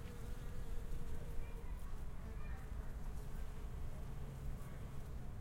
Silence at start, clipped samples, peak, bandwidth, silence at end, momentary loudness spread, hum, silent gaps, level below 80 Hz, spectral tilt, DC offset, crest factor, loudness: 0 s; under 0.1%; -30 dBFS; 16 kHz; 0 s; 1 LU; none; none; -46 dBFS; -6.5 dB/octave; under 0.1%; 14 dB; -51 LUFS